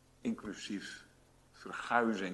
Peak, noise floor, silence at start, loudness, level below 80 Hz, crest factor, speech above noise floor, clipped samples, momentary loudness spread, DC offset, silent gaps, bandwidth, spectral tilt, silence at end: -14 dBFS; -64 dBFS; 0.25 s; -37 LUFS; -70 dBFS; 24 dB; 28 dB; under 0.1%; 18 LU; under 0.1%; none; 12 kHz; -4.5 dB/octave; 0 s